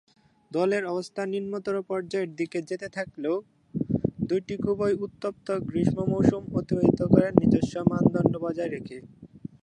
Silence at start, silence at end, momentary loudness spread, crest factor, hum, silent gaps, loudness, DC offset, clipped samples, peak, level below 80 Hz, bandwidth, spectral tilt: 0.5 s; 0.15 s; 12 LU; 26 dB; none; none; -27 LUFS; under 0.1%; under 0.1%; -2 dBFS; -52 dBFS; 10.5 kHz; -8 dB/octave